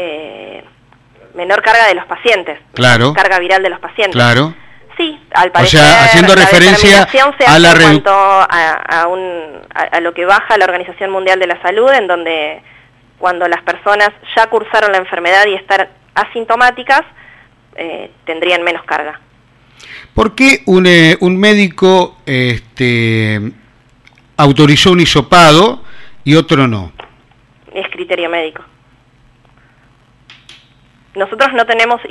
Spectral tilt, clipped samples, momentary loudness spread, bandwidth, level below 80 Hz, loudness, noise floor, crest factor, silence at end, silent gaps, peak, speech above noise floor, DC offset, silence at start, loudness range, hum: -4.5 dB/octave; 1%; 18 LU; 16 kHz; -38 dBFS; -9 LUFS; -48 dBFS; 10 dB; 0 s; none; 0 dBFS; 39 dB; under 0.1%; 0 s; 12 LU; none